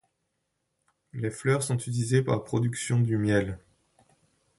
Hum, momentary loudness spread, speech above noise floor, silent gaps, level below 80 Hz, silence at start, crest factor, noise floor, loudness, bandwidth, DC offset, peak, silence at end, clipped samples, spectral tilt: none; 10 LU; 53 dB; none; -56 dBFS; 1.15 s; 20 dB; -79 dBFS; -27 LUFS; 11.5 kHz; under 0.1%; -10 dBFS; 1 s; under 0.1%; -6 dB/octave